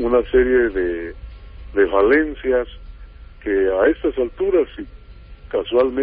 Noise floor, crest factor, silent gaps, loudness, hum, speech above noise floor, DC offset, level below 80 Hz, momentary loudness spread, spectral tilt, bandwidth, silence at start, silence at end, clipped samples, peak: -40 dBFS; 14 dB; none; -19 LUFS; none; 22 dB; under 0.1%; -36 dBFS; 16 LU; -10.5 dB/octave; 4.6 kHz; 0 s; 0 s; under 0.1%; -4 dBFS